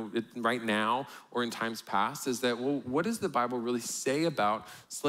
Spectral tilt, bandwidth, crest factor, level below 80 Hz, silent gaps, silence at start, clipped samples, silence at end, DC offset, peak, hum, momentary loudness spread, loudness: -4 dB/octave; 16 kHz; 16 dB; -74 dBFS; none; 0 s; under 0.1%; 0 s; under 0.1%; -14 dBFS; none; 6 LU; -31 LUFS